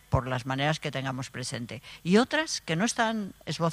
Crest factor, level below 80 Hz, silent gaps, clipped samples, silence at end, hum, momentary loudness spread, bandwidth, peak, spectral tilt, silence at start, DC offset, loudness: 22 dB; -50 dBFS; none; under 0.1%; 0 s; none; 11 LU; 15.5 kHz; -8 dBFS; -4.5 dB/octave; 0.1 s; under 0.1%; -29 LUFS